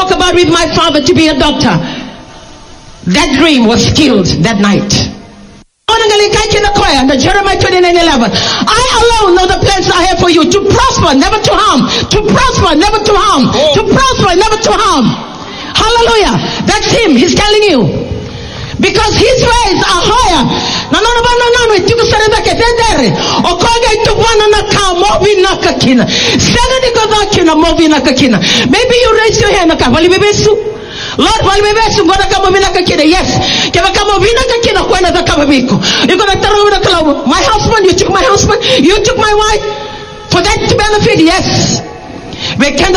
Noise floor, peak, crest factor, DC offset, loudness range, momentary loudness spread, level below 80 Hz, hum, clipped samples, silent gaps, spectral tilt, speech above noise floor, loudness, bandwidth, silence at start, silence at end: -35 dBFS; 0 dBFS; 8 dB; under 0.1%; 2 LU; 5 LU; -24 dBFS; none; 0.9%; none; -4 dB/octave; 28 dB; -7 LUFS; 14 kHz; 0 s; 0 s